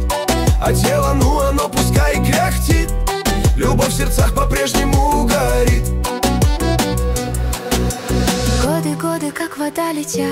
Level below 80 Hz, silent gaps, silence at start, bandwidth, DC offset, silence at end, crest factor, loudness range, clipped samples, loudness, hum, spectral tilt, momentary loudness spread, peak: -20 dBFS; none; 0 s; 16.5 kHz; under 0.1%; 0 s; 12 dB; 3 LU; under 0.1%; -17 LUFS; none; -5 dB/octave; 5 LU; -4 dBFS